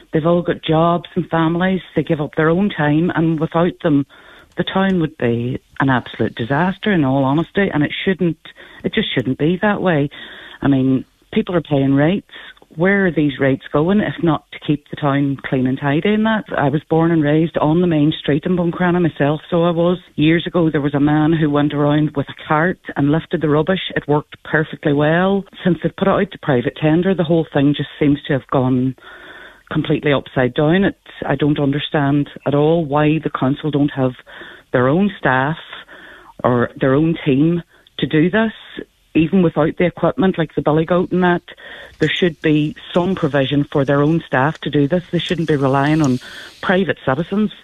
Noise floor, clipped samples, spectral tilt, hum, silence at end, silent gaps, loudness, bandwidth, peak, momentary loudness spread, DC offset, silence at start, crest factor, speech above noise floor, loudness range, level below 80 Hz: -40 dBFS; under 0.1%; -8 dB/octave; none; 0.1 s; none; -17 LUFS; 7.8 kHz; 0 dBFS; 7 LU; under 0.1%; 0.15 s; 16 dB; 24 dB; 2 LU; -46 dBFS